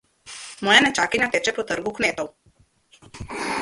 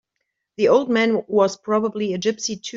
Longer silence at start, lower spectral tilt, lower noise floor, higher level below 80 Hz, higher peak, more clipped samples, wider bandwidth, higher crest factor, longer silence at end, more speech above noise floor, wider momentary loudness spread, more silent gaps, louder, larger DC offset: second, 0.25 s vs 0.6 s; second, -2 dB/octave vs -4.5 dB/octave; second, -60 dBFS vs -77 dBFS; first, -54 dBFS vs -66 dBFS; about the same, -2 dBFS vs -4 dBFS; neither; first, 11.5 kHz vs 7.8 kHz; first, 22 dB vs 16 dB; about the same, 0 s vs 0 s; second, 39 dB vs 58 dB; first, 21 LU vs 6 LU; neither; about the same, -20 LUFS vs -20 LUFS; neither